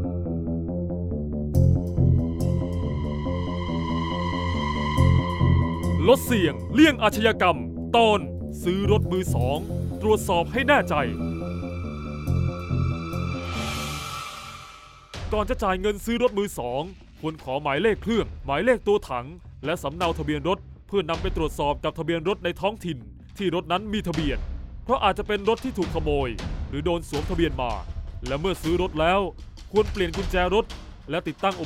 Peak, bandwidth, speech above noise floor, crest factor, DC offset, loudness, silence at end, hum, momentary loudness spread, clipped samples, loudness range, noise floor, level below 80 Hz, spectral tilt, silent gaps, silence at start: -4 dBFS; 16 kHz; 22 dB; 20 dB; under 0.1%; -25 LUFS; 0 s; none; 12 LU; under 0.1%; 7 LU; -46 dBFS; -36 dBFS; -6 dB/octave; none; 0 s